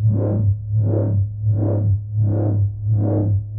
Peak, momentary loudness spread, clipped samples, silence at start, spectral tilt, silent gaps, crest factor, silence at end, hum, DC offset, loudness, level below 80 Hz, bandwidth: -8 dBFS; 2 LU; under 0.1%; 0 s; -15.5 dB/octave; none; 10 dB; 0 s; none; under 0.1%; -20 LUFS; -40 dBFS; 1.7 kHz